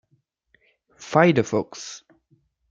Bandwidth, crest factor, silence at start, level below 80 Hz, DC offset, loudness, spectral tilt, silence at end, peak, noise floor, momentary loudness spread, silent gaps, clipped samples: 7.8 kHz; 22 dB; 1 s; -66 dBFS; under 0.1%; -21 LUFS; -6 dB/octave; 0.75 s; -2 dBFS; -68 dBFS; 23 LU; none; under 0.1%